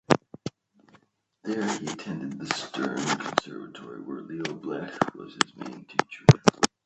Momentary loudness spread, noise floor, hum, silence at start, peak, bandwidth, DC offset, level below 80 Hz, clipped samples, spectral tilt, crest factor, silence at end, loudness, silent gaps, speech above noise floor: 20 LU; -62 dBFS; none; 0.1 s; 0 dBFS; 10.5 kHz; under 0.1%; -56 dBFS; under 0.1%; -5 dB/octave; 28 dB; 0.2 s; -27 LUFS; none; 35 dB